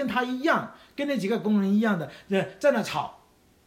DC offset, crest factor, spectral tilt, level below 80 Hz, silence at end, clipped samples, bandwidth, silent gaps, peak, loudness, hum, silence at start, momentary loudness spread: under 0.1%; 18 dB; -6 dB/octave; -66 dBFS; 0.55 s; under 0.1%; 15.5 kHz; none; -8 dBFS; -26 LUFS; none; 0 s; 9 LU